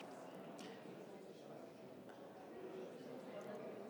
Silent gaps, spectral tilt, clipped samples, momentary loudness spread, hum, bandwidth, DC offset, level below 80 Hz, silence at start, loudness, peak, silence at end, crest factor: none; -5.5 dB/octave; under 0.1%; 5 LU; none; 19 kHz; under 0.1%; under -90 dBFS; 0 s; -54 LUFS; -40 dBFS; 0 s; 14 dB